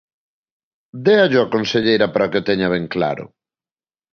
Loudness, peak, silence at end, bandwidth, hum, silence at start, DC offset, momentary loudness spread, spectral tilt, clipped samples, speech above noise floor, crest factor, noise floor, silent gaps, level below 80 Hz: -17 LUFS; -2 dBFS; 0.85 s; 6.6 kHz; none; 0.95 s; under 0.1%; 8 LU; -6 dB/octave; under 0.1%; over 73 dB; 18 dB; under -90 dBFS; none; -54 dBFS